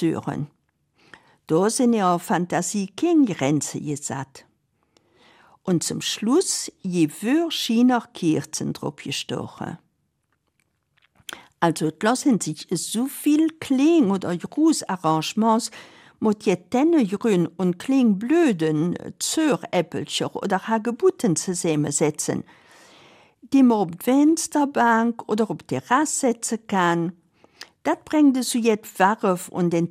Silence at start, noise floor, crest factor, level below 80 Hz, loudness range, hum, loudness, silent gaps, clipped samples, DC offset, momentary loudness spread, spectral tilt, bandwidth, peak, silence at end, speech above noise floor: 0 s; -72 dBFS; 18 dB; -68 dBFS; 5 LU; none; -22 LUFS; none; under 0.1%; under 0.1%; 10 LU; -4.5 dB/octave; 15.5 kHz; -4 dBFS; 0 s; 51 dB